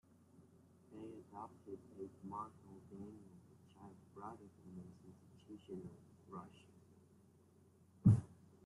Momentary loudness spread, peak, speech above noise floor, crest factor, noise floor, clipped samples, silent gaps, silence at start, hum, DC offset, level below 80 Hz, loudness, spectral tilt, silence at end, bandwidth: 27 LU; -18 dBFS; 15 dB; 28 dB; -69 dBFS; under 0.1%; none; 0.4 s; none; under 0.1%; -70 dBFS; -43 LUFS; -10 dB/octave; 0.3 s; 11 kHz